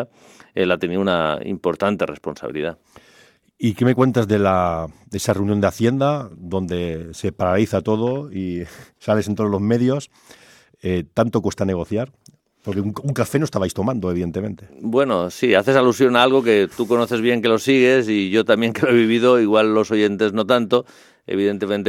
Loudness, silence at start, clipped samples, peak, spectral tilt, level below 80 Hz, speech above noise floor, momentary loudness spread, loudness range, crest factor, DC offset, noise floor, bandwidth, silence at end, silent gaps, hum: -19 LUFS; 0 s; under 0.1%; 0 dBFS; -6 dB/octave; -56 dBFS; 33 dB; 12 LU; 7 LU; 20 dB; under 0.1%; -52 dBFS; 16 kHz; 0 s; none; none